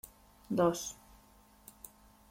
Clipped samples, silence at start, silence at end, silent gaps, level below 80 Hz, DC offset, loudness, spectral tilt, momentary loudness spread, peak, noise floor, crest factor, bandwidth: under 0.1%; 0.05 s; 0.45 s; none; -64 dBFS; under 0.1%; -34 LUFS; -5 dB/octave; 25 LU; -16 dBFS; -62 dBFS; 22 dB; 16.5 kHz